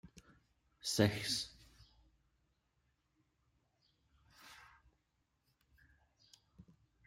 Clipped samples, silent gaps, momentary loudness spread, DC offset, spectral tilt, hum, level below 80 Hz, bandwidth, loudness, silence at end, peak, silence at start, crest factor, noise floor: under 0.1%; none; 26 LU; under 0.1%; -4 dB/octave; none; -72 dBFS; 16 kHz; -37 LUFS; 0.45 s; -16 dBFS; 0.85 s; 30 dB; -82 dBFS